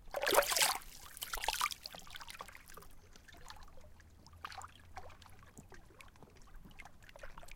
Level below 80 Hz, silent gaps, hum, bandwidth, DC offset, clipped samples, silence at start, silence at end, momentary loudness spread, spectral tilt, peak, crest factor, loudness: -58 dBFS; none; none; 17 kHz; under 0.1%; under 0.1%; 0 s; 0 s; 28 LU; -0.5 dB/octave; -12 dBFS; 30 dB; -36 LUFS